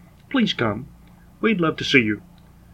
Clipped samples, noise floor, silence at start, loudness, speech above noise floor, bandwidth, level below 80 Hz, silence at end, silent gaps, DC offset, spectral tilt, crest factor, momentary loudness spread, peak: under 0.1%; -47 dBFS; 0.3 s; -21 LUFS; 27 dB; 12 kHz; -52 dBFS; 0.55 s; none; under 0.1%; -5.5 dB/octave; 22 dB; 9 LU; 0 dBFS